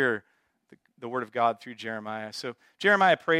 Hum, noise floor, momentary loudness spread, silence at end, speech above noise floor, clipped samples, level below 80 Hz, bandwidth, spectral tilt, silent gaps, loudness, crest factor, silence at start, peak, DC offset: none; -60 dBFS; 16 LU; 0 s; 33 dB; under 0.1%; -82 dBFS; 14 kHz; -4.5 dB/octave; none; -27 LUFS; 20 dB; 0 s; -8 dBFS; under 0.1%